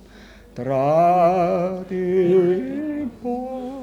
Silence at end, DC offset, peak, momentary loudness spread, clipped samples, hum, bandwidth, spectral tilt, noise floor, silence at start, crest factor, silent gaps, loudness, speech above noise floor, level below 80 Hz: 0 s; under 0.1%; -8 dBFS; 12 LU; under 0.1%; none; 11.5 kHz; -8.5 dB/octave; -45 dBFS; 0.15 s; 14 dB; none; -20 LUFS; 27 dB; -52 dBFS